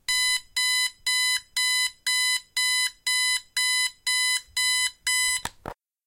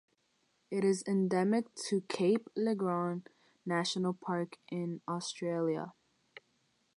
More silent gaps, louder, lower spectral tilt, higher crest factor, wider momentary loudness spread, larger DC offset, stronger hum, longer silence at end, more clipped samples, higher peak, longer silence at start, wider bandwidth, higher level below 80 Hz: neither; first, -23 LUFS vs -34 LUFS; second, 3 dB/octave vs -5.5 dB/octave; about the same, 14 dB vs 16 dB; second, 2 LU vs 9 LU; neither; neither; second, 0.35 s vs 1.05 s; neither; first, -12 dBFS vs -18 dBFS; second, 0.1 s vs 0.7 s; first, 16.5 kHz vs 11.5 kHz; first, -60 dBFS vs -82 dBFS